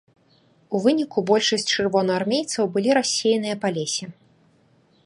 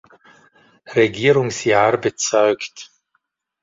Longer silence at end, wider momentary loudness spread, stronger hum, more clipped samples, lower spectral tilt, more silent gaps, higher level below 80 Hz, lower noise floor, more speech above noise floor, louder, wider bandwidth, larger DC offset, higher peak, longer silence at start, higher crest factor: first, 0.95 s vs 0.8 s; second, 7 LU vs 10 LU; neither; neither; about the same, -3.5 dB/octave vs -4 dB/octave; neither; second, -68 dBFS vs -58 dBFS; second, -59 dBFS vs -70 dBFS; second, 38 dB vs 53 dB; second, -22 LUFS vs -17 LUFS; first, 11.5 kHz vs 7.8 kHz; neither; about the same, -4 dBFS vs -2 dBFS; second, 0.7 s vs 0.9 s; about the same, 18 dB vs 18 dB